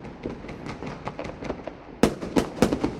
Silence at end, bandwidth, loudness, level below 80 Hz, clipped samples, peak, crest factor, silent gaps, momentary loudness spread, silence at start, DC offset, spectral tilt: 0 s; 16 kHz; -29 LUFS; -44 dBFS; under 0.1%; -2 dBFS; 26 dB; none; 13 LU; 0 s; under 0.1%; -5.5 dB/octave